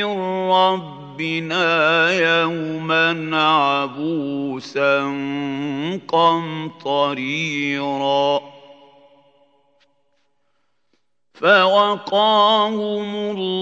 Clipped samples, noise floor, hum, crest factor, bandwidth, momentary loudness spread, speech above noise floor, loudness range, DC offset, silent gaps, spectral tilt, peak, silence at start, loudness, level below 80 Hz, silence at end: under 0.1%; -71 dBFS; none; 20 dB; 8 kHz; 10 LU; 53 dB; 7 LU; under 0.1%; none; -5 dB/octave; 0 dBFS; 0 s; -18 LUFS; -74 dBFS; 0 s